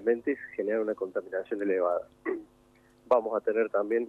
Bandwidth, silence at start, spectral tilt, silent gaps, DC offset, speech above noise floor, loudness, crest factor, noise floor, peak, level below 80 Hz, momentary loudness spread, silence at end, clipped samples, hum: 4.4 kHz; 0 s; -7.5 dB/octave; none; under 0.1%; 32 dB; -30 LUFS; 18 dB; -61 dBFS; -12 dBFS; -72 dBFS; 9 LU; 0 s; under 0.1%; none